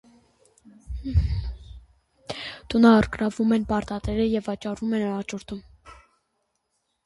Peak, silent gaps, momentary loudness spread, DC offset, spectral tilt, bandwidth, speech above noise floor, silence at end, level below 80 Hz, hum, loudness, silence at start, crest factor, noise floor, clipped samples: -6 dBFS; none; 21 LU; under 0.1%; -7 dB/octave; 11.5 kHz; 52 dB; 1.1 s; -36 dBFS; none; -24 LUFS; 0.9 s; 20 dB; -75 dBFS; under 0.1%